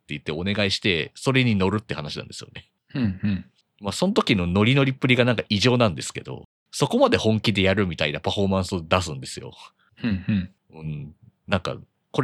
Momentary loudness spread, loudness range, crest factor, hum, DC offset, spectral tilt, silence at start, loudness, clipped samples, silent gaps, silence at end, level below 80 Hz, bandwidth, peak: 17 LU; 6 LU; 22 dB; none; under 0.1%; -5.5 dB/octave; 0.1 s; -23 LUFS; under 0.1%; 6.45-6.66 s; 0 s; -52 dBFS; 13 kHz; -2 dBFS